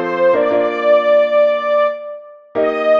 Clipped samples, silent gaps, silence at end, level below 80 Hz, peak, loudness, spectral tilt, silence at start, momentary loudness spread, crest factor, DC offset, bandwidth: under 0.1%; none; 0 s; -62 dBFS; -2 dBFS; -14 LUFS; -6 dB/octave; 0 s; 14 LU; 12 dB; under 0.1%; 6.2 kHz